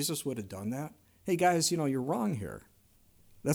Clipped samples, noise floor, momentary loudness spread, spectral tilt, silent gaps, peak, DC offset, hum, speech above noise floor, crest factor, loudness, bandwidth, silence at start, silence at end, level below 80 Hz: under 0.1%; -64 dBFS; 17 LU; -4.5 dB/octave; none; -16 dBFS; under 0.1%; none; 32 dB; 18 dB; -32 LUFS; over 20 kHz; 0 s; 0 s; -64 dBFS